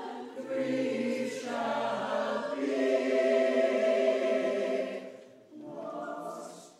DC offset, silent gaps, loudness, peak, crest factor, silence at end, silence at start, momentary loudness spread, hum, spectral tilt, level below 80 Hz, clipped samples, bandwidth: under 0.1%; none; -30 LUFS; -14 dBFS; 16 dB; 0.1 s; 0 s; 15 LU; none; -4.5 dB/octave; -86 dBFS; under 0.1%; 12.5 kHz